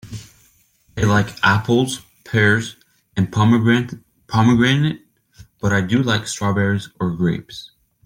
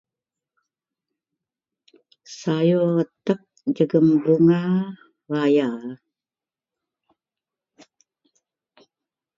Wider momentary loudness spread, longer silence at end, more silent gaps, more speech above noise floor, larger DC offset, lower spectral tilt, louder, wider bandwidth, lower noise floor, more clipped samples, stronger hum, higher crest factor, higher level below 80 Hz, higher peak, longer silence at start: first, 18 LU vs 15 LU; second, 0.4 s vs 3.4 s; neither; second, 40 dB vs over 70 dB; neither; second, -5.5 dB/octave vs -8 dB/octave; first, -18 LUFS vs -21 LUFS; first, 16 kHz vs 7.4 kHz; second, -57 dBFS vs under -90 dBFS; neither; neither; about the same, 18 dB vs 18 dB; first, -48 dBFS vs -72 dBFS; first, -2 dBFS vs -6 dBFS; second, 0.05 s vs 2.3 s